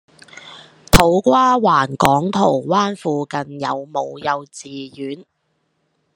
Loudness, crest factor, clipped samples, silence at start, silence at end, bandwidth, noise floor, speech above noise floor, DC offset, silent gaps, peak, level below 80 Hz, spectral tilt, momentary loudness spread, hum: -17 LUFS; 18 dB; under 0.1%; 0.45 s; 0.95 s; 13 kHz; -68 dBFS; 50 dB; under 0.1%; none; 0 dBFS; -32 dBFS; -5 dB/octave; 18 LU; none